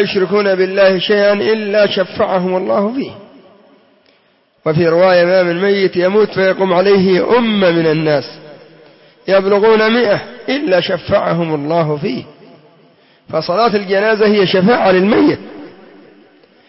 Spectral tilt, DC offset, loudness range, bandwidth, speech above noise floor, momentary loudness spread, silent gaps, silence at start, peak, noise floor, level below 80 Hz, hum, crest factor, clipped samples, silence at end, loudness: -9 dB/octave; under 0.1%; 5 LU; 6 kHz; 43 dB; 9 LU; none; 0 s; -2 dBFS; -55 dBFS; -54 dBFS; none; 12 dB; under 0.1%; 1 s; -13 LUFS